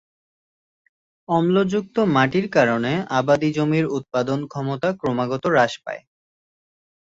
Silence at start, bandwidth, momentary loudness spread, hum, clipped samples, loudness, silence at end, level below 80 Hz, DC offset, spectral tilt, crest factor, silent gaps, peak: 1.3 s; 7.8 kHz; 7 LU; none; under 0.1%; -21 LUFS; 1.05 s; -60 dBFS; under 0.1%; -6.5 dB/octave; 18 dB; none; -2 dBFS